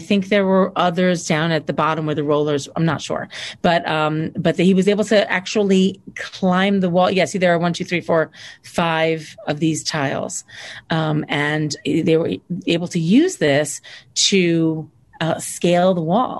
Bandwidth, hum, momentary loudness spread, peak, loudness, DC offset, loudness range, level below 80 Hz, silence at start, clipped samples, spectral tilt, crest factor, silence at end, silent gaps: 12.5 kHz; none; 10 LU; -4 dBFS; -18 LUFS; under 0.1%; 4 LU; -56 dBFS; 0 s; under 0.1%; -5 dB/octave; 16 dB; 0 s; none